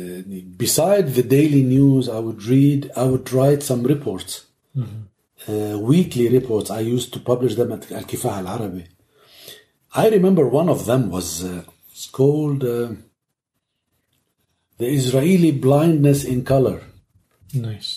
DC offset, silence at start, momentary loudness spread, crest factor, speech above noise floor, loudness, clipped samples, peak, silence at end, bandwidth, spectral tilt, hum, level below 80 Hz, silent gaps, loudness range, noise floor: under 0.1%; 0 s; 16 LU; 16 dB; 59 dB; -19 LUFS; under 0.1%; -4 dBFS; 0 s; 15.5 kHz; -6.5 dB/octave; none; -52 dBFS; none; 7 LU; -77 dBFS